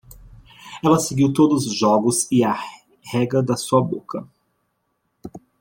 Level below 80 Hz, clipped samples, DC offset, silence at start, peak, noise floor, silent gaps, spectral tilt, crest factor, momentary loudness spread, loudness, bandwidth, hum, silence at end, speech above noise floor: -54 dBFS; under 0.1%; under 0.1%; 0.65 s; -2 dBFS; -71 dBFS; none; -5.5 dB/octave; 18 dB; 19 LU; -19 LUFS; 16.5 kHz; none; 0.2 s; 53 dB